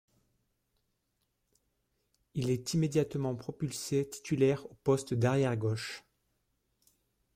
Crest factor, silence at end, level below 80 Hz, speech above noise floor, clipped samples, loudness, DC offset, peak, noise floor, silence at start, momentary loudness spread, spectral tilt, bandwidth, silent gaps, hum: 18 dB; 1.35 s; -66 dBFS; 49 dB; under 0.1%; -32 LUFS; under 0.1%; -16 dBFS; -80 dBFS; 2.35 s; 9 LU; -6 dB/octave; 16 kHz; none; none